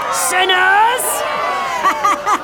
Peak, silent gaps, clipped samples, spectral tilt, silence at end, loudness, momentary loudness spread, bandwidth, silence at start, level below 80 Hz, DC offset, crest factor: -2 dBFS; none; under 0.1%; 0 dB/octave; 0 s; -14 LUFS; 7 LU; 19 kHz; 0 s; -52 dBFS; under 0.1%; 12 dB